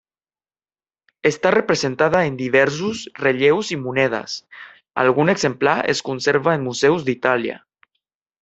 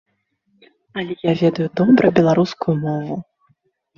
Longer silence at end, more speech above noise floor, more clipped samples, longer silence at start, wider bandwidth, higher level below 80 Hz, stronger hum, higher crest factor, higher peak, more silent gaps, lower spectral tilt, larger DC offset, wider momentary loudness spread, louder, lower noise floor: about the same, 0.85 s vs 0.75 s; first, over 71 dB vs 50 dB; neither; first, 1.25 s vs 0.95 s; first, 8.2 kHz vs 7.2 kHz; about the same, -60 dBFS vs -56 dBFS; neither; about the same, 20 dB vs 18 dB; about the same, 0 dBFS vs 0 dBFS; neither; second, -5 dB/octave vs -8 dB/octave; neither; second, 9 LU vs 16 LU; about the same, -19 LUFS vs -18 LUFS; first, under -90 dBFS vs -66 dBFS